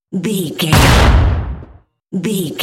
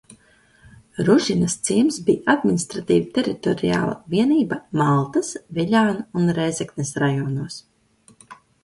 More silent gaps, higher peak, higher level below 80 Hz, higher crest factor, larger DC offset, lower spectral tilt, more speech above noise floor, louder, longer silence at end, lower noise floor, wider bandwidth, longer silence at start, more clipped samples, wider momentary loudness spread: neither; about the same, 0 dBFS vs -2 dBFS; first, -18 dBFS vs -56 dBFS; second, 14 dB vs 20 dB; neither; about the same, -5 dB/octave vs -5.5 dB/octave; second, 30 dB vs 36 dB; first, -13 LUFS vs -21 LUFS; second, 0 s vs 0.3 s; second, -42 dBFS vs -56 dBFS; first, 16.5 kHz vs 11.5 kHz; about the same, 0.1 s vs 0.1 s; neither; first, 16 LU vs 8 LU